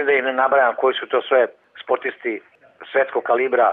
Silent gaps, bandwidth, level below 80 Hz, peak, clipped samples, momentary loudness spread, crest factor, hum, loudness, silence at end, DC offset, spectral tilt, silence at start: none; 4 kHz; -74 dBFS; -6 dBFS; under 0.1%; 11 LU; 14 dB; none; -19 LUFS; 0 s; under 0.1%; -6.5 dB/octave; 0 s